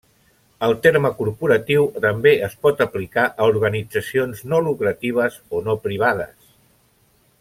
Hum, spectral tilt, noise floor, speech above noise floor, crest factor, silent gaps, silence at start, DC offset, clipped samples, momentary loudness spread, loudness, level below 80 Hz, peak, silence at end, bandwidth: none; -6 dB/octave; -59 dBFS; 40 dB; 18 dB; none; 0.6 s; under 0.1%; under 0.1%; 7 LU; -19 LUFS; -56 dBFS; -2 dBFS; 1.15 s; 16 kHz